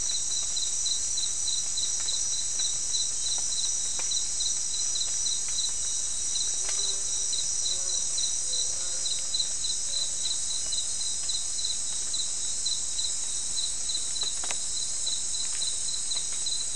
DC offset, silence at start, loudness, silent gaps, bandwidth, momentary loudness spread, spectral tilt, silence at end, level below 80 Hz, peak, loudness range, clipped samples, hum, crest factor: 2%; 0 s; -27 LUFS; none; 12 kHz; 2 LU; 2 dB/octave; 0 s; -54 dBFS; -8 dBFS; 2 LU; under 0.1%; none; 22 dB